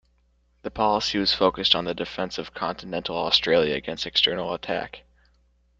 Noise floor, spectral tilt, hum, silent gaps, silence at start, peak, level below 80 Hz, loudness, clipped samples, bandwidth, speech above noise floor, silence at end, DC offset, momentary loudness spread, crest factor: -65 dBFS; -4 dB/octave; none; none; 0.65 s; -2 dBFS; -52 dBFS; -23 LUFS; under 0.1%; 8.8 kHz; 40 dB; 0.8 s; under 0.1%; 11 LU; 24 dB